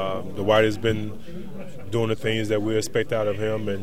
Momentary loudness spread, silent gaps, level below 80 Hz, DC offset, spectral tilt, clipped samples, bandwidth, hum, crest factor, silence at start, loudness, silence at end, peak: 18 LU; none; -50 dBFS; 3%; -5.5 dB/octave; under 0.1%; 16 kHz; none; 20 dB; 0 s; -24 LUFS; 0 s; -4 dBFS